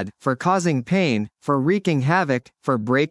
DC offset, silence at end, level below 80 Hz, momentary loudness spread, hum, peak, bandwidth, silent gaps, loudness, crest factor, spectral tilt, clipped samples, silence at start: under 0.1%; 0 s; -66 dBFS; 5 LU; none; -4 dBFS; 12 kHz; none; -21 LUFS; 16 dB; -6.5 dB/octave; under 0.1%; 0 s